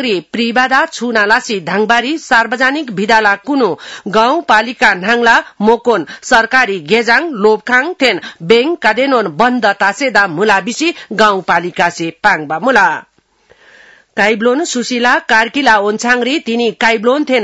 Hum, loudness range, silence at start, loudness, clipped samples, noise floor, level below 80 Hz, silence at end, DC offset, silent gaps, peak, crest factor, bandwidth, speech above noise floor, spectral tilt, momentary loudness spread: none; 3 LU; 0 s; -12 LUFS; 0.4%; -51 dBFS; -50 dBFS; 0 s; 0.2%; none; 0 dBFS; 12 dB; 12 kHz; 39 dB; -3.5 dB/octave; 5 LU